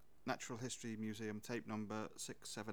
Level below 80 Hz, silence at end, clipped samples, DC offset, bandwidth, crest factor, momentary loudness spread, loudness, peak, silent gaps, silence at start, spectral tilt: -78 dBFS; 0 s; under 0.1%; 0.1%; over 20 kHz; 20 dB; 3 LU; -47 LUFS; -26 dBFS; none; 0.25 s; -4 dB/octave